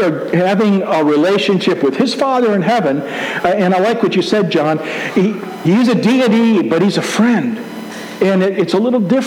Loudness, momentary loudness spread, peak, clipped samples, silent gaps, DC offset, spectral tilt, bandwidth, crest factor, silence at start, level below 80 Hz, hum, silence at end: -14 LUFS; 6 LU; -2 dBFS; under 0.1%; none; under 0.1%; -6 dB/octave; 15.5 kHz; 12 dB; 0 s; -62 dBFS; none; 0 s